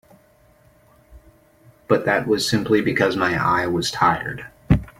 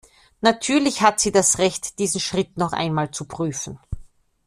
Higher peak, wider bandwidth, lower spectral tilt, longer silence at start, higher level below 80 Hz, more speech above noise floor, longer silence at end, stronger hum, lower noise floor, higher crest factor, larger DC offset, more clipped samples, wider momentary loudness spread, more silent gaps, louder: about the same, -2 dBFS vs -2 dBFS; first, 16.5 kHz vs 14.5 kHz; first, -5 dB/octave vs -3.5 dB/octave; first, 1.1 s vs 0.4 s; first, -40 dBFS vs -46 dBFS; first, 35 dB vs 22 dB; second, 0.1 s vs 0.45 s; neither; first, -55 dBFS vs -43 dBFS; about the same, 20 dB vs 20 dB; neither; neither; second, 4 LU vs 14 LU; neither; about the same, -20 LUFS vs -21 LUFS